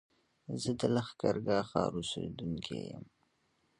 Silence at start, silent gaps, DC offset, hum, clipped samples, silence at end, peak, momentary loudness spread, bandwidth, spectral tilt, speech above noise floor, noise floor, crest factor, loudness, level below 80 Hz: 0.5 s; none; under 0.1%; none; under 0.1%; 0.75 s; -14 dBFS; 12 LU; 11.5 kHz; -5.5 dB/octave; 41 dB; -75 dBFS; 24 dB; -35 LUFS; -62 dBFS